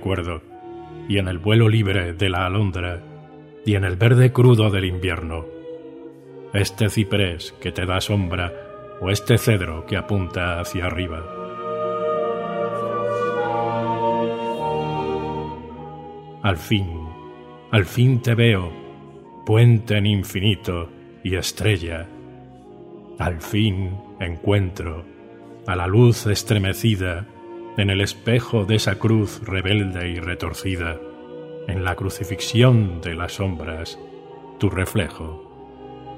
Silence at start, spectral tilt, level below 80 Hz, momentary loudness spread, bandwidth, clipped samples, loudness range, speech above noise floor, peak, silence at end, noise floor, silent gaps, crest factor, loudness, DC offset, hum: 0 s; -6 dB/octave; -42 dBFS; 21 LU; 15.5 kHz; under 0.1%; 6 LU; 22 dB; -2 dBFS; 0 s; -42 dBFS; none; 20 dB; -21 LUFS; under 0.1%; none